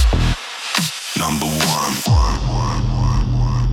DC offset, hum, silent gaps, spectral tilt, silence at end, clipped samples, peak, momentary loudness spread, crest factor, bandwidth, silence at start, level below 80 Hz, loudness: under 0.1%; none; none; -4.5 dB/octave; 0 s; under 0.1%; 0 dBFS; 4 LU; 16 dB; 17.5 kHz; 0 s; -22 dBFS; -18 LUFS